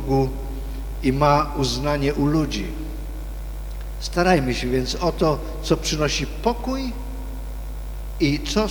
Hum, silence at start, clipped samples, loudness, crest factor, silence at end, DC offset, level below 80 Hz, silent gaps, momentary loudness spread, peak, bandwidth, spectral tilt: 50 Hz at -30 dBFS; 0 s; under 0.1%; -23 LUFS; 20 dB; 0 s; under 0.1%; -30 dBFS; none; 15 LU; -4 dBFS; over 20 kHz; -5.5 dB/octave